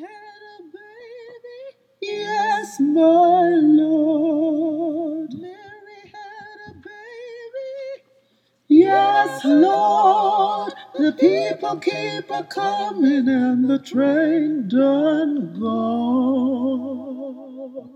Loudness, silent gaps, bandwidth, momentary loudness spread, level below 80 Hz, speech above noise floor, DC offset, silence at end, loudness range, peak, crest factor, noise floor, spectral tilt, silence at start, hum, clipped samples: -18 LUFS; none; 9.2 kHz; 23 LU; -74 dBFS; 45 dB; under 0.1%; 0.05 s; 9 LU; -2 dBFS; 18 dB; -63 dBFS; -6 dB/octave; 0 s; none; under 0.1%